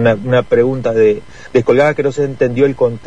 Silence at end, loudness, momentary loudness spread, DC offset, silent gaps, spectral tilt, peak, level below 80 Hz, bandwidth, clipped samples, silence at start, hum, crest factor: 0.1 s; -14 LUFS; 5 LU; 2%; none; -7.5 dB/octave; 0 dBFS; -44 dBFS; 9 kHz; under 0.1%; 0 s; none; 12 dB